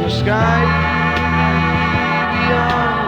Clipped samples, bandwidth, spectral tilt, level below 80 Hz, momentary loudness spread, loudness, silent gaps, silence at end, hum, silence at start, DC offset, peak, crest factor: under 0.1%; 8.2 kHz; -6.5 dB/octave; -30 dBFS; 2 LU; -15 LUFS; none; 0 s; none; 0 s; under 0.1%; 0 dBFS; 14 dB